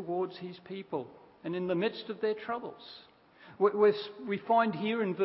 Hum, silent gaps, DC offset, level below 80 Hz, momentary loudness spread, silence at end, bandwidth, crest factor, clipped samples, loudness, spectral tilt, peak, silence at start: none; none; under 0.1%; -78 dBFS; 17 LU; 0 s; 5.6 kHz; 18 dB; under 0.1%; -32 LUFS; -4.5 dB/octave; -14 dBFS; 0 s